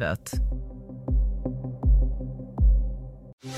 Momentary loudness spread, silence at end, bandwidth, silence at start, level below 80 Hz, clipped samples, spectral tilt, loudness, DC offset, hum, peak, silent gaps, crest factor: 15 LU; 0 s; 11 kHz; 0 s; -26 dBFS; under 0.1%; -6.5 dB/octave; -28 LUFS; under 0.1%; none; -12 dBFS; 3.33-3.38 s; 14 dB